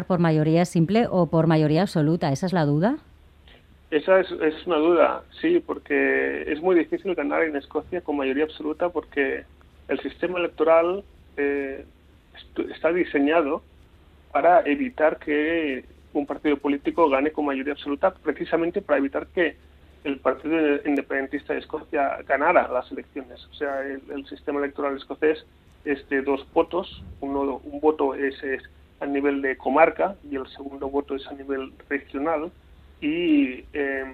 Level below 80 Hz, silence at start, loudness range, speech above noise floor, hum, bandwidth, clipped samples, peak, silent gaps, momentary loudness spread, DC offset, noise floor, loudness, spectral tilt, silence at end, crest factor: -54 dBFS; 0 s; 4 LU; 29 dB; none; 11 kHz; under 0.1%; -2 dBFS; none; 12 LU; under 0.1%; -52 dBFS; -24 LUFS; -7.5 dB/octave; 0 s; 22 dB